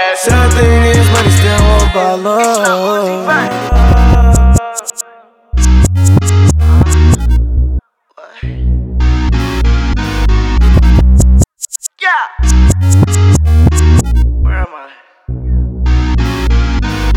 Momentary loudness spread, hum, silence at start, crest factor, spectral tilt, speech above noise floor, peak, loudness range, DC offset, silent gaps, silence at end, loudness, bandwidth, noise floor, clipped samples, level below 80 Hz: 9 LU; none; 0 s; 8 dB; -5.5 dB/octave; 32 dB; 0 dBFS; 4 LU; under 0.1%; none; 0 s; -10 LUFS; 15 kHz; -41 dBFS; under 0.1%; -12 dBFS